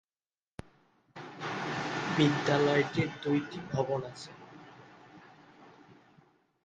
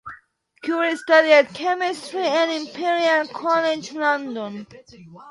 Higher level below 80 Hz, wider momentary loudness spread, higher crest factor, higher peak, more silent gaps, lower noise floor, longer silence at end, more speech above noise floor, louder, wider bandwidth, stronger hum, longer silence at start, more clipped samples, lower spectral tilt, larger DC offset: about the same, -68 dBFS vs -70 dBFS; first, 25 LU vs 15 LU; about the same, 22 dB vs 20 dB; second, -12 dBFS vs -2 dBFS; neither; first, under -90 dBFS vs -52 dBFS; first, 0.7 s vs 0 s; first, over 60 dB vs 31 dB; second, -31 LUFS vs -20 LUFS; second, 9.4 kHz vs 11.5 kHz; neither; first, 1.15 s vs 0.05 s; neither; first, -6 dB/octave vs -3.5 dB/octave; neither